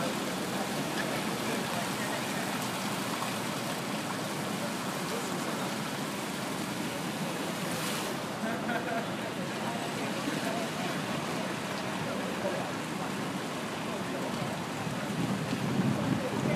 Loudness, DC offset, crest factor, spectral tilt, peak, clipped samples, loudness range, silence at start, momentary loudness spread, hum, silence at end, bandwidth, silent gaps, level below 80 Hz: -33 LUFS; under 0.1%; 16 dB; -4 dB/octave; -16 dBFS; under 0.1%; 2 LU; 0 s; 3 LU; none; 0 s; 15.5 kHz; none; -66 dBFS